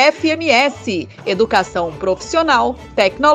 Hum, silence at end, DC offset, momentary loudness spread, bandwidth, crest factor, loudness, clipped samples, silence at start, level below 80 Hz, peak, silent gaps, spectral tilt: none; 0 s; under 0.1%; 9 LU; 11.5 kHz; 16 dB; -16 LUFS; under 0.1%; 0 s; -44 dBFS; 0 dBFS; none; -3.5 dB/octave